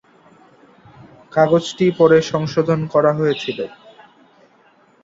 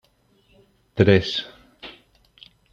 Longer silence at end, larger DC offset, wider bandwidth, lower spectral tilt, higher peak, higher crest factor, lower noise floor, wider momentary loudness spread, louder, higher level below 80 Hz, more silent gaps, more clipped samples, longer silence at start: first, 1.35 s vs 0.8 s; neither; about the same, 7.8 kHz vs 7.4 kHz; about the same, -6.5 dB/octave vs -7 dB/octave; about the same, -2 dBFS vs -2 dBFS; about the same, 18 dB vs 22 dB; second, -54 dBFS vs -62 dBFS; second, 11 LU vs 24 LU; first, -17 LUFS vs -20 LUFS; about the same, -58 dBFS vs -54 dBFS; neither; neither; first, 1.35 s vs 0.95 s